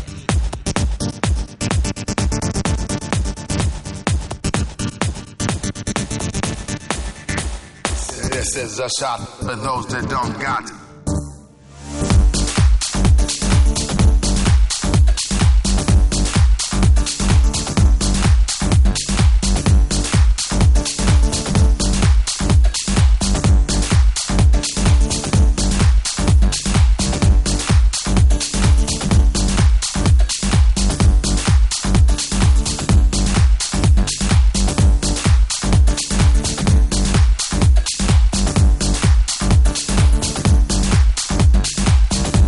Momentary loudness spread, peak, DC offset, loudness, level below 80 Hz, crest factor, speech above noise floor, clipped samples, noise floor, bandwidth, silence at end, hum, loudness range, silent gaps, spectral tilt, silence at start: 7 LU; -2 dBFS; under 0.1%; -17 LUFS; -16 dBFS; 14 dB; 17 dB; under 0.1%; -40 dBFS; 11.5 kHz; 0 s; none; 7 LU; none; -4.5 dB/octave; 0 s